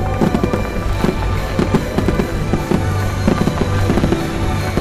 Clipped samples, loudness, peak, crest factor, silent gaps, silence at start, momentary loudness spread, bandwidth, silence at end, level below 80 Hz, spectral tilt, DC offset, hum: under 0.1%; -18 LUFS; -4 dBFS; 12 dB; none; 0 s; 3 LU; 14.5 kHz; 0 s; -24 dBFS; -6.5 dB/octave; 0.2%; none